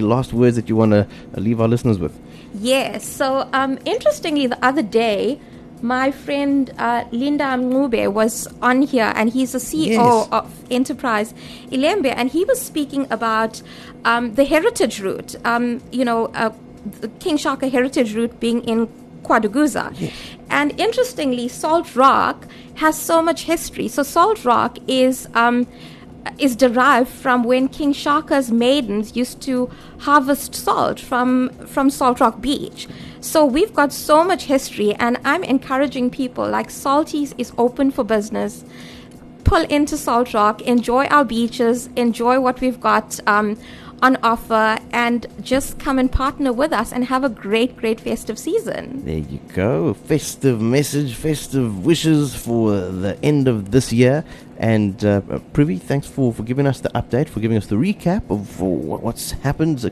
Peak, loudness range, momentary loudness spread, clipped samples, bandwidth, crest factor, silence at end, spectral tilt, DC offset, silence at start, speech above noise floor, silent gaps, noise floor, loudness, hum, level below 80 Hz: -2 dBFS; 3 LU; 9 LU; under 0.1%; 13 kHz; 16 dB; 0 s; -5.5 dB/octave; under 0.1%; 0 s; 21 dB; none; -39 dBFS; -18 LUFS; none; -40 dBFS